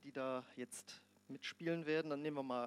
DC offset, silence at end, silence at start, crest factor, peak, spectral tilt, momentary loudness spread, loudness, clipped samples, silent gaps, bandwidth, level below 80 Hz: under 0.1%; 0 s; 0.05 s; 18 dB; -26 dBFS; -5 dB/octave; 16 LU; -44 LUFS; under 0.1%; none; 15.5 kHz; under -90 dBFS